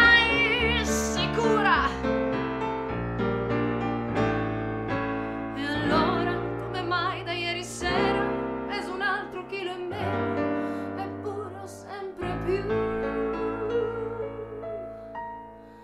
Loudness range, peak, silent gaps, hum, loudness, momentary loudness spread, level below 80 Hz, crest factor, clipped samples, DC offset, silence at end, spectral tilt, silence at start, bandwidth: 5 LU; -6 dBFS; none; none; -27 LUFS; 13 LU; -44 dBFS; 22 dB; under 0.1%; under 0.1%; 0 s; -4.5 dB/octave; 0 s; 15 kHz